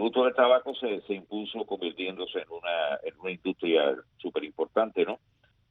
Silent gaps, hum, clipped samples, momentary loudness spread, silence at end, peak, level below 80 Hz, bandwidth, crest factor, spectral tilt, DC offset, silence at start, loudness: none; none; under 0.1%; 12 LU; 0.55 s; -10 dBFS; -72 dBFS; 4.4 kHz; 20 dB; -7 dB/octave; under 0.1%; 0 s; -29 LUFS